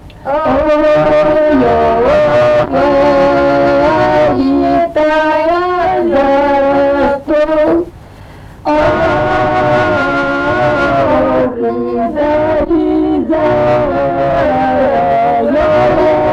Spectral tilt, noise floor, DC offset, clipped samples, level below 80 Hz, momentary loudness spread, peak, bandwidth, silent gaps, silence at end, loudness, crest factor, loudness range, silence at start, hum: -7.5 dB/octave; -33 dBFS; under 0.1%; under 0.1%; -32 dBFS; 4 LU; -2 dBFS; 8.2 kHz; none; 0 s; -11 LUFS; 10 dB; 3 LU; 0.05 s; none